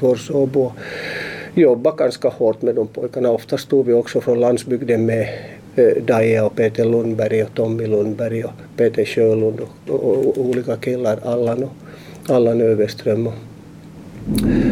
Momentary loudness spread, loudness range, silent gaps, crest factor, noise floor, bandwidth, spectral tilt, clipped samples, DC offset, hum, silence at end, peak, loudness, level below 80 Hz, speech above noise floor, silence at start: 11 LU; 2 LU; none; 14 dB; -38 dBFS; 16 kHz; -7 dB/octave; under 0.1%; under 0.1%; none; 0 s; -2 dBFS; -18 LUFS; -44 dBFS; 21 dB; 0 s